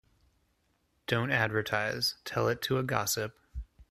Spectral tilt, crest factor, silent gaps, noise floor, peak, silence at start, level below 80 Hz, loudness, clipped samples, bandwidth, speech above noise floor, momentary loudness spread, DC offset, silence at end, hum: -4 dB/octave; 22 dB; none; -74 dBFS; -10 dBFS; 1.1 s; -54 dBFS; -31 LUFS; under 0.1%; 15.5 kHz; 43 dB; 17 LU; under 0.1%; 0.1 s; none